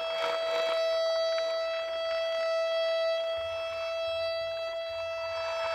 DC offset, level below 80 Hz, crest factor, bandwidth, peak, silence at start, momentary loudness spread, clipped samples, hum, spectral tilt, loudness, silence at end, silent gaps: under 0.1%; -66 dBFS; 14 dB; 12.5 kHz; -18 dBFS; 0 s; 6 LU; under 0.1%; none; -1 dB/octave; -31 LUFS; 0 s; none